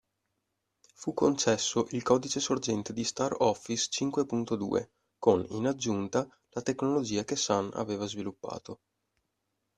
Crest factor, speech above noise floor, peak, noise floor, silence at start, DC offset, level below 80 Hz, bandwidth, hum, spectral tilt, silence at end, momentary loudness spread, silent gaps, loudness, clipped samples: 22 dB; 52 dB; -10 dBFS; -82 dBFS; 1 s; under 0.1%; -68 dBFS; 10.5 kHz; none; -4 dB/octave; 1.05 s; 11 LU; none; -30 LUFS; under 0.1%